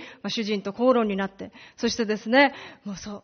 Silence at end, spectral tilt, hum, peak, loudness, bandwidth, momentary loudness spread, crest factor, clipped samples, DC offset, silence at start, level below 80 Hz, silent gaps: 0.05 s; -3 dB/octave; none; -6 dBFS; -24 LUFS; 6.6 kHz; 18 LU; 20 dB; under 0.1%; under 0.1%; 0 s; -60 dBFS; none